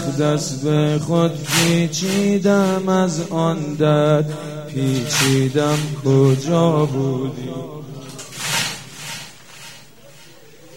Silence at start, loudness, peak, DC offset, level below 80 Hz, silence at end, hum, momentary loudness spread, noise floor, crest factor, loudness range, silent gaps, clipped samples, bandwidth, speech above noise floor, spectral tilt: 0 s; -18 LUFS; -2 dBFS; 0.5%; -56 dBFS; 0 s; none; 17 LU; -45 dBFS; 18 dB; 8 LU; none; under 0.1%; 16.5 kHz; 27 dB; -5 dB/octave